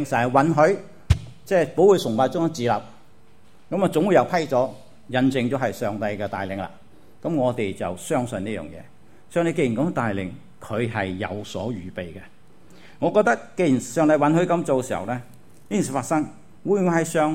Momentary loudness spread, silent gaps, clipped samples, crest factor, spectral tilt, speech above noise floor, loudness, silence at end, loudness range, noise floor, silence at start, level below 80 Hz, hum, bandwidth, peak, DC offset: 13 LU; none; under 0.1%; 20 dB; -6 dB/octave; 33 dB; -23 LUFS; 0 s; 6 LU; -55 dBFS; 0 s; -44 dBFS; none; 16 kHz; -2 dBFS; 0.6%